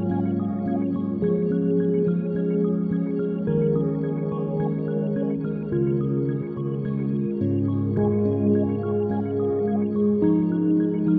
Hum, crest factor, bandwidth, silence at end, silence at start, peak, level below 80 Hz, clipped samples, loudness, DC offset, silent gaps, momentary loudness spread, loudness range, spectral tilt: none; 12 dB; 3.5 kHz; 0 s; 0 s; -10 dBFS; -54 dBFS; under 0.1%; -24 LUFS; under 0.1%; none; 5 LU; 3 LU; -13.5 dB/octave